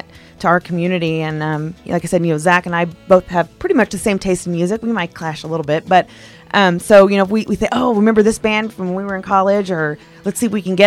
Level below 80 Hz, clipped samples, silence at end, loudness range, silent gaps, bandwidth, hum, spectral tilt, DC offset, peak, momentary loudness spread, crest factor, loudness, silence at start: -44 dBFS; under 0.1%; 0 s; 4 LU; none; 15 kHz; none; -5.5 dB/octave; under 0.1%; 0 dBFS; 10 LU; 16 dB; -16 LUFS; 0.15 s